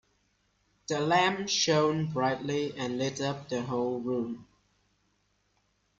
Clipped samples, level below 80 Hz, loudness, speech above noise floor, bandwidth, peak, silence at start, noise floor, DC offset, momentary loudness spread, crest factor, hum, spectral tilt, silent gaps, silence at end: under 0.1%; -68 dBFS; -29 LUFS; 44 dB; 7.8 kHz; -12 dBFS; 0.9 s; -73 dBFS; under 0.1%; 10 LU; 18 dB; 50 Hz at -60 dBFS; -4 dB/octave; none; 1.55 s